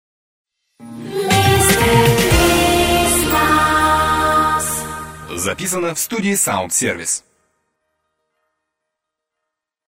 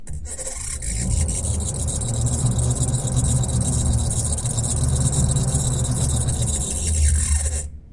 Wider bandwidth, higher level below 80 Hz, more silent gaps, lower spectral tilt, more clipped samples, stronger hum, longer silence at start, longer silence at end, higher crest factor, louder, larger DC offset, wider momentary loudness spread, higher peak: first, 16.5 kHz vs 11.5 kHz; about the same, -32 dBFS vs -28 dBFS; neither; about the same, -3.5 dB/octave vs -4.5 dB/octave; neither; neither; first, 0.8 s vs 0 s; first, 2.7 s vs 0.05 s; about the same, 16 dB vs 14 dB; first, -15 LUFS vs -22 LUFS; neither; first, 11 LU vs 6 LU; first, 0 dBFS vs -6 dBFS